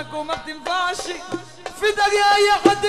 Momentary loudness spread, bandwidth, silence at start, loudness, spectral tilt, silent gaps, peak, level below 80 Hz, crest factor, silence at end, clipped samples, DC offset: 16 LU; 15 kHz; 0 s; -19 LUFS; -2.5 dB/octave; none; 0 dBFS; -50 dBFS; 20 dB; 0 s; under 0.1%; 0.5%